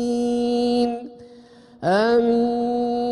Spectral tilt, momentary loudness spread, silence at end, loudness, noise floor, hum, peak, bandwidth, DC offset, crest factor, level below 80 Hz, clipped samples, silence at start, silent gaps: -6 dB/octave; 9 LU; 0 s; -21 LUFS; -47 dBFS; none; -8 dBFS; 11 kHz; under 0.1%; 14 dB; -56 dBFS; under 0.1%; 0 s; none